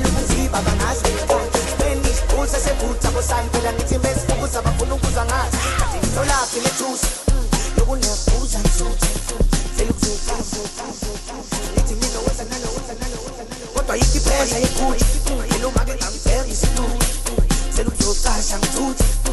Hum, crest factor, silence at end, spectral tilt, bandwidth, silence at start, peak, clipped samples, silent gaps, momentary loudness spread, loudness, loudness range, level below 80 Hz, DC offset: none; 14 dB; 0 s; -4 dB/octave; 12.5 kHz; 0 s; -4 dBFS; under 0.1%; none; 7 LU; -20 LUFS; 3 LU; -20 dBFS; under 0.1%